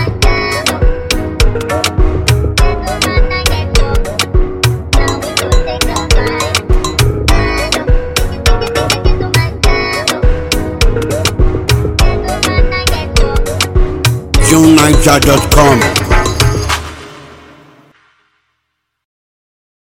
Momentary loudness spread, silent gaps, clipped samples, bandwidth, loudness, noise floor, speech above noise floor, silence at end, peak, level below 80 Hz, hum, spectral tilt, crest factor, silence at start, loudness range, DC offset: 7 LU; none; 0.5%; 17 kHz; -12 LUFS; -69 dBFS; 62 dB; 2.55 s; 0 dBFS; -14 dBFS; none; -4.5 dB/octave; 10 dB; 0 s; 5 LU; under 0.1%